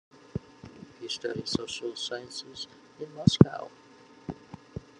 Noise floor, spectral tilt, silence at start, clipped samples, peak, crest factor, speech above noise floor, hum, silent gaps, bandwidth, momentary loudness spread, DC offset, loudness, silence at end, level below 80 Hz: -49 dBFS; -6 dB/octave; 0.35 s; under 0.1%; 0 dBFS; 30 dB; 21 dB; none; none; 11 kHz; 23 LU; under 0.1%; -29 LUFS; 0.2 s; -56 dBFS